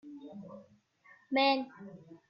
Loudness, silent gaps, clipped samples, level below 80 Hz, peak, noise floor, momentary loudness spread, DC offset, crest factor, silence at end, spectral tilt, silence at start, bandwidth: -30 LUFS; none; under 0.1%; -84 dBFS; -16 dBFS; -63 dBFS; 23 LU; under 0.1%; 20 dB; 0.15 s; -6 dB/octave; 0.05 s; 6.4 kHz